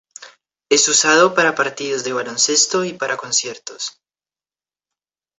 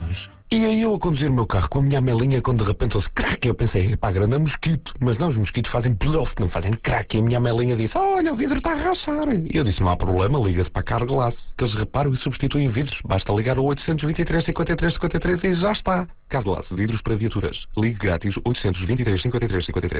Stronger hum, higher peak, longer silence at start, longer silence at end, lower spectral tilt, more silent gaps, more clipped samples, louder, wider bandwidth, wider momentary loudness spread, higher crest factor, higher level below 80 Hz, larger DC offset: neither; first, -2 dBFS vs -8 dBFS; first, 0.2 s vs 0 s; first, 1.5 s vs 0 s; second, -1 dB/octave vs -11.5 dB/octave; neither; neither; first, -16 LUFS vs -22 LUFS; first, 8.4 kHz vs 4 kHz; first, 15 LU vs 4 LU; about the same, 18 dB vs 14 dB; second, -68 dBFS vs -32 dBFS; neither